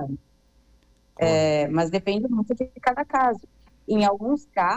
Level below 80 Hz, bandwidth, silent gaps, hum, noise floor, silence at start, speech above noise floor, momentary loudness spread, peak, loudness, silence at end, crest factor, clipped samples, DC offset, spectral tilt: -54 dBFS; 9 kHz; none; none; -60 dBFS; 0 s; 37 dB; 10 LU; -10 dBFS; -24 LUFS; 0 s; 14 dB; under 0.1%; under 0.1%; -6 dB/octave